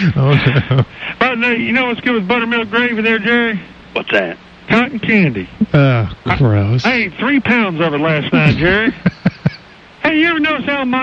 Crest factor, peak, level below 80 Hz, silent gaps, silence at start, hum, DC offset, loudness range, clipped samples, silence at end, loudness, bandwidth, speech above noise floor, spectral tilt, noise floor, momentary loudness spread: 12 dB; -2 dBFS; -40 dBFS; none; 0 s; none; under 0.1%; 2 LU; under 0.1%; 0 s; -14 LUFS; 7 kHz; 25 dB; -7.5 dB/octave; -38 dBFS; 6 LU